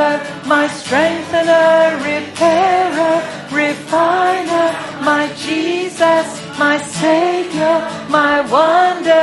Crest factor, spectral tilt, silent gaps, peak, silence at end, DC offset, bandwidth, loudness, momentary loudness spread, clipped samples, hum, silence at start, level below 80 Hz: 14 dB; -4 dB/octave; none; 0 dBFS; 0 s; under 0.1%; 11.5 kHz; -14 LUFS; 7 LU; under 0.1%; none; 0 s; -60 dBFS